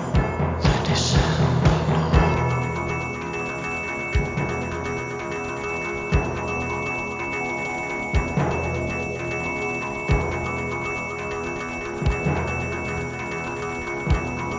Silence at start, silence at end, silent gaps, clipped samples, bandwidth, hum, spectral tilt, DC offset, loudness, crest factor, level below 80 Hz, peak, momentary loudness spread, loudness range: 0 s; 0 s; none; under 0.1%; 7.6 kHz; none; -6 dB/octave; under 0.1%; -24 LUFS; 20 dB; -32 dBFS; -2 dBFS; 8 LU; 5 LU